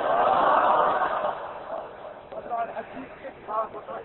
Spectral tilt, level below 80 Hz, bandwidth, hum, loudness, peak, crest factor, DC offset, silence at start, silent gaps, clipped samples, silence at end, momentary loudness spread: -8.5 dB/octave; -62 dBFS; 4.2 kHz; none; -25 LUFS; -8 dBFS; 18 dB; under 0.1%; 0 s; none; under 0.1%; 0 s; 20 LU